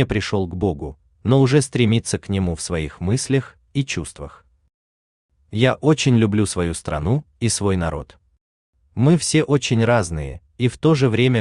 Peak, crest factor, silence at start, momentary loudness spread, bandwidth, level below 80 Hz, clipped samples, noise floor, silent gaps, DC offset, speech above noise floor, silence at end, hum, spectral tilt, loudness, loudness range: -4 dBFS; 16 dB; 0 s; 12 LU; 12.5 kHz; -42 dBFS; under 0.1%; under -90 dBFS; 4.74-5.29 s, 8.41-8.73 s; under 0.1%; over 71 dB; 0 s; none; -5.5 dB/octave; -20 LUFS; 4 LU